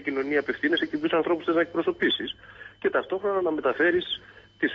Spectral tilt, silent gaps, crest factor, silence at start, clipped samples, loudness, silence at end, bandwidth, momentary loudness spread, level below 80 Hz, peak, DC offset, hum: -6 dB/octave; none; 14 dB; 0 s; under 0.1%; -26 LUFS; 0 s; 6.2 kHz; 9 LU; -62 dBFS; -12 dBFS; under 0.1%; none